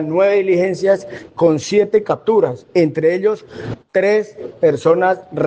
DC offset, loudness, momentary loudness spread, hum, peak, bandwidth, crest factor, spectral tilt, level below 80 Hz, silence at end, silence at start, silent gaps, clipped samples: under 0.1%; -16 LUFS; 7 LU; none; -2 dBFS; 8.8 kHz; 14 dB; -6.5 dB/octave; -58 dBFS; 0 s; 0 s; none; under 0.1%